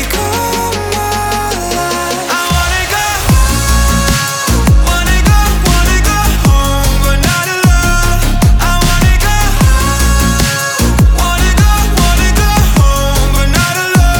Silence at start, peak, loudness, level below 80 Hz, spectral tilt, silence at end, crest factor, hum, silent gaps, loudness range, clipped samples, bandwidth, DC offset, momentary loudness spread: 0 s; 0 dBFS; -11 LUFS; -12 dBFS; -4 dB/octave; 0 s; 10 dB; none; none; 2 LU; under 0.1%; over 20 kHz; under 0.1%; 4 LU